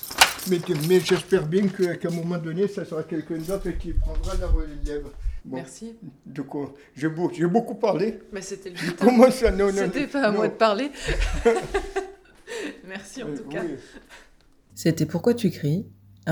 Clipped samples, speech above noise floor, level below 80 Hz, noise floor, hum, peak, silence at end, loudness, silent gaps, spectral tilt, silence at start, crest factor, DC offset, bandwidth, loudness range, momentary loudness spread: under 0.1%; 31 dB; -34 dBFS; -55 dBFS; none; 0 dBFS; 0 s; -24 LUFS; none; -5 dB/octave; 0 s; 24 dB; under 0.1%; over 20 kHz; 10 LU; 16 LU